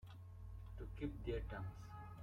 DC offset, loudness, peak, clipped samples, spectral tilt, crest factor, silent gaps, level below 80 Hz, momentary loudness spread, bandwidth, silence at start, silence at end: under 0.1%; -50 LUFS; -32 dBFS; under 0.1%; -8 dB/octave; 18 dB; none; -54 dBFS; 10 LU; 14.5 kHz; 0 s; 0 s